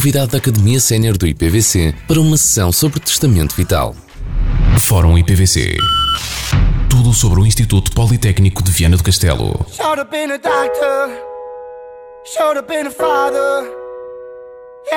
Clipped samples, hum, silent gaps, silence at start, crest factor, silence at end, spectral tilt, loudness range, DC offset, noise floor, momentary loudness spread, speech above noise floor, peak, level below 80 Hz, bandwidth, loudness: under 0.1%; none; none; 0 s; 12 dB; 0 s; -4.5 dB/octave; 6 LU; under 0.1%; -35 dBFS; 17 LU; 22 dB; -2 dBFS; -22 dBFS; over 20 kHz; -13 LUFS